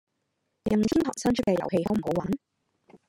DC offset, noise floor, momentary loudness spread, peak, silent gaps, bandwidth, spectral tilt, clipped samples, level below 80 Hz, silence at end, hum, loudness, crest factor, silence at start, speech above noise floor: under 0.1%; -78 dBFS; 9 LU; -10 dBFS; none; 16 kHz; -6 dB/octave; under 0.1%; -54 dBFS; 0.1 s; none; -27 LUFS; 18 dB; 0.65 s; 52 dB